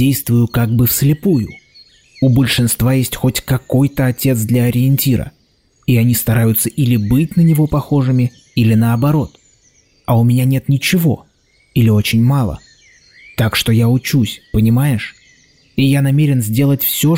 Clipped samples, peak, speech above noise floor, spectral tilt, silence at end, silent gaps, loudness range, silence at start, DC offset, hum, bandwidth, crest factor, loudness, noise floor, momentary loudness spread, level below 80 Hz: under 0.1%; -4 dBFS; 43 dB; -6 dB/octave; 0 s; none; 2 LU; 0 s; 0.2%; none; 16.5 kHz; 10 dB; -14 LUFS; -56 dBFS; 6 LU; -38 dBFS